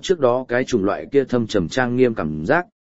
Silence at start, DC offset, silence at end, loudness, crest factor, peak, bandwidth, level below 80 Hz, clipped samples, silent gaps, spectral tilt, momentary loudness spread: 0 s; 0.8%; 0.15 s; -20 LUFS; 16 dB; -2 dBFS; 8 kHz; -48 dBFS; under 0.1%; none; -6 dB/octave; 3 LU